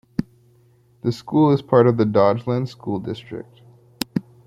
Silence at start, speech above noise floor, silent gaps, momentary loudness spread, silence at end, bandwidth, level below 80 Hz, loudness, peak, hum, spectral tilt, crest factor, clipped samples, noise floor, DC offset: 0.2 s; 37 dB; none; 15 LU; 0.25 s; 16.5 kHz; -56 dBFS; -20 LUFS; -2 dBFS; none; -7.5 dB/octave; 20 dB; under 0.1%; -56 dBFS; under 0.1%